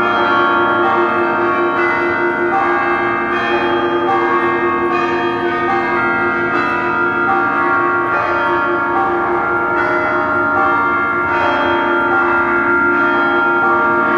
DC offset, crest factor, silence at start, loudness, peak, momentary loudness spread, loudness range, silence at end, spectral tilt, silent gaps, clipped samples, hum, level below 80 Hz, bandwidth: under 0.1%; 12 dB; 0 s; -14 LUFS; -2 dBFS; 3 LU; 2 LU; 0 s; -6.5 dB/octave; none; under 0.1%; none; -48 dBFS; 7 kHz